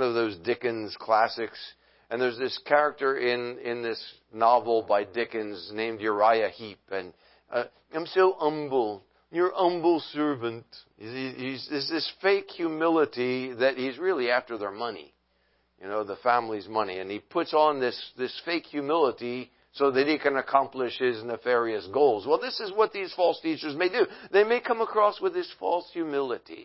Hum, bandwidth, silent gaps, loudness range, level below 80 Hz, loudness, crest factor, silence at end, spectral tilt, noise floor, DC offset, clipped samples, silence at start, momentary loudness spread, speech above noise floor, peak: none; 5.8 kHz; none; 3 LU; -72 dBFS; -27 LUFS; 22 dB; 0 s; -8.5 dB/octave; -70 dBFS; under 0.1%; under 0.1%; 0 s; 12 LU; 43 dB; -6 dBFS